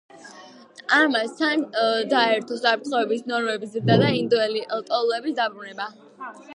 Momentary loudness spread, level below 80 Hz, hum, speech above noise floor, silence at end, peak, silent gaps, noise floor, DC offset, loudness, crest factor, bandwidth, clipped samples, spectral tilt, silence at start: 15 LU; -64 dBFS; none; 23 dB; 0 s; -6 dBFS; none; -46 dBFS; under 0.1%; -22 LUFS; 18 dB; 11 kHz; under 0.1%; -5.5 dB/octave; 0.15 s